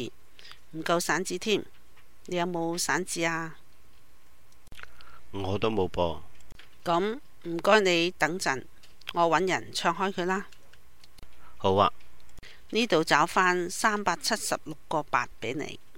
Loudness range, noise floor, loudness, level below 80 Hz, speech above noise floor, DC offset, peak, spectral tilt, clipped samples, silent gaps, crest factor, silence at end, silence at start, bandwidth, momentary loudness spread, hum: 6 LU; -61 dBFS; -28 LUFS; -56 dBFS; 34 dB; 0.8%; -6 dBFS; -3.5 dB/octave; under 0.1%; none; 24 dB; 0.2 s; 0 s; 16.5 kHz; 14 LU; none